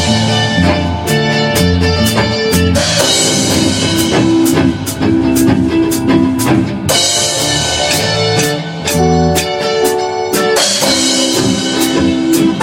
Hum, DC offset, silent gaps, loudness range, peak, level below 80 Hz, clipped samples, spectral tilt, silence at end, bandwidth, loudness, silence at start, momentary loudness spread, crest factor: none; under 0.1%; none; 1 LU; 0 dBFS; -32 dBFS; under 0.1%; -4 dB/octave; 0 s; 17 kHz; -11 LUFS; 0 s; 4 LU; 12 dB